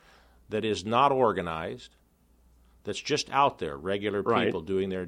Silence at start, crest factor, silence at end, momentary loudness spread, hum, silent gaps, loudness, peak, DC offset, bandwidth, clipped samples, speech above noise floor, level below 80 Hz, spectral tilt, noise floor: 0.5 s; 20 dB; 0 s; 12 LU; none; none; -28 LUFS; -10 dBFS; under 0.1%; 11.5 kHz; under 0.1%; 35 dB; -58 dBFS; -5 dB/octave; -63 dBFS